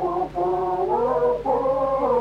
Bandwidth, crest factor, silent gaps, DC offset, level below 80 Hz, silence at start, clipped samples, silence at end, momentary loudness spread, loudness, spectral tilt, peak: 7.2 kHz; 12 dB; none; under 0.1%; -46 dBFS; 0 s; under 0.1%; 0 s; 3 LU; -22 LUFS; -8 dB/octave; -10 dBFS